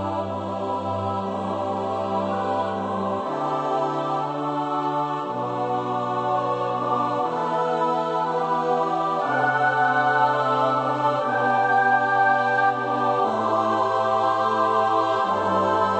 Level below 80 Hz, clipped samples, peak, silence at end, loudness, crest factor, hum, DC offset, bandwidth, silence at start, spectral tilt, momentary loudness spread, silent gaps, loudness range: -70 dBFS; under 0.1%; -8 dBFS; 0 s; -23 LUFS; 14 dB; none; under 0.1%; 8.6 kHz; 0 s; -6 dB/octave; 7 LU; none; 5 LU